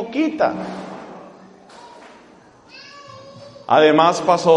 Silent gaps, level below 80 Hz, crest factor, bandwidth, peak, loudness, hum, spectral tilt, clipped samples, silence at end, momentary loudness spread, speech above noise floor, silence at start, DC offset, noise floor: none; -64 dBFS; 20 dB; 10.5 kHz; 0 dBFS; -17 LUFS; none; -5 dB/octave; under 0.1%; 0 s; 27 LU; 32 dB; 0 s; under 0.1%; -48 dBFS